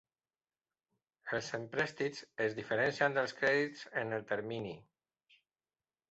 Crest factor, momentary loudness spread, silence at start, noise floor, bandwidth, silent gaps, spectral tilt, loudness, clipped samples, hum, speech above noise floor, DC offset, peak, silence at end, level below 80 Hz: 22 dB; 10 LU; 1.25 s; under -90 dBFS; 8 kHz; none; -3 dB/octave; -35 LUFS; under 0.1%; none; over 54 dB; under 0.1%; -16 dBFS; 1.3 s; -76 dBFS